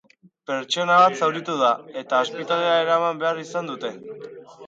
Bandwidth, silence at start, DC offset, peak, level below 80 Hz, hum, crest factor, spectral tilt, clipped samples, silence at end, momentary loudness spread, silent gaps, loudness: 9 kHz; 0.5 s; under 0.1%; -4 dBFS; -78 dBFS; none; 20 dB; -4 dB/octave; under 0.1%; 0 s; 21 LU; none; -21 LUFS